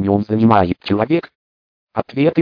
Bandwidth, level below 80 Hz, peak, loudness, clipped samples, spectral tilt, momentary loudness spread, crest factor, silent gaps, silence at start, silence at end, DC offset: 5.4 kHz; -48 dBFS; 0 dBFS; -17 LUFS; under 0.1%; -10 dB/octave; 11 LU; 16 dB; 1.35-1.87 s; 0 s; 0 s; under 0.1%